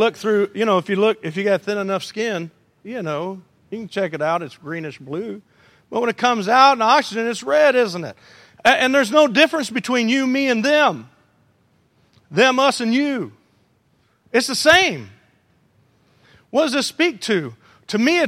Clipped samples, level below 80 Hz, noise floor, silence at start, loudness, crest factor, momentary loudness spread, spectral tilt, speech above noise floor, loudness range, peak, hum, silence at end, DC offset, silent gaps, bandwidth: under 0.1%; -62 dBFS; -62 dBFS; 0 s; -18 LUFS; 20 dB; 16 LU; -3.5 dB/octave; 43 dB; 8 LU; 0 dBFS; none; 0 s; under 0.1%; none; 16 kHz